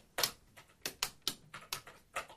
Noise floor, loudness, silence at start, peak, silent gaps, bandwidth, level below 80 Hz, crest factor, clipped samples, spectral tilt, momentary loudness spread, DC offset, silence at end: -62 dBFS; -40 LUFS; 0.2 s; -12 dBFS; none; 15.5 kHz; -66 dBFS; 30 dB; under 0.1%; 0 dB/octave; 15 LU; under 0.1%; 0 s